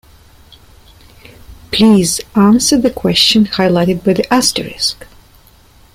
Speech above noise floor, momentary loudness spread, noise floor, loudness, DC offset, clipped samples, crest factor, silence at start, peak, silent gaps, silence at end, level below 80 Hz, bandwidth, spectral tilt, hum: 33 dB; 8 LU; -45 dBFS; -12 LUFS; under 0.1%; under 0.1%; 14 dB; 1.5 s; 0 dBFS; none; 0.9 s; -40 dBFS; 16 kHz; -4 dB/octave; none